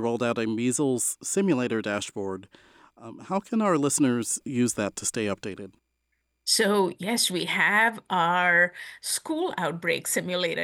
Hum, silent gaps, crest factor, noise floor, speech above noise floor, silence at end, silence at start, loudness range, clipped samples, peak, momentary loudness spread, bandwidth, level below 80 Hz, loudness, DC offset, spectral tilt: none; none; 18 dB; -76 dBFS; 50 dB; 0 s; 0 s; 4 LU; under 0.1%; -8 dBFS; 13 LU; 17.5 kHz; -70 dBFS; -25 LUFS; under 0.1%; -3 dB/octave